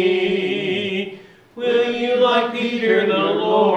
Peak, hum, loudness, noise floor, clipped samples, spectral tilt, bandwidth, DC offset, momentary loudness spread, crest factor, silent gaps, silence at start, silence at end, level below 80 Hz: -4 dBFS; none; -19 LUFS; -40 dBFS; under 0.1%; -6 dB/octave; 9 kHz; under 0.1%; 8 LU; 14 dB; none; 0 s; 0 s; -66 dBFS